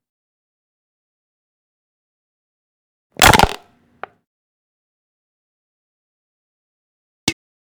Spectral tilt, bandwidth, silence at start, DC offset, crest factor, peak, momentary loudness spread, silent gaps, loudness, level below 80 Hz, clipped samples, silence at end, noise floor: -2.5 dB/octave; over 20 kHz; 3.2 s; under 0.1%; 24 dB; 0 dBFS; 14 LU; 4.27-7.27 s; -14 LUFS; -38 dBFS; under 0.1%; 0.4 s; -41 dBFS